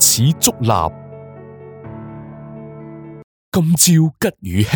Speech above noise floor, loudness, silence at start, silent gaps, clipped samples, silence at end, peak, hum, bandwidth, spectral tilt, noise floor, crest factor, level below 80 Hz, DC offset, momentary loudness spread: 21 dB; -15 LUFS; 0 s; 3.24-3.52 s; under 0.1%; 0 s; 0 dBFS; none; over 20 kHz; -4 dB/octave; -36 dBFS; 18 dB; -48 dBFS; under 0.1%; 25 LU